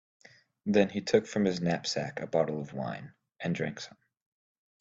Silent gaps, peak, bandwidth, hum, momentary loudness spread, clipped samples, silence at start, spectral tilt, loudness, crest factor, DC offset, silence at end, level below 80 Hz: none; -10 dBFS; 7.8 kHz; none; 12 LU; under 0.1%; 0.65 s; -5.5 dB/octave; -31 LUFS; 22 dB; under 0.1%; 0.9 s; -68 dBFS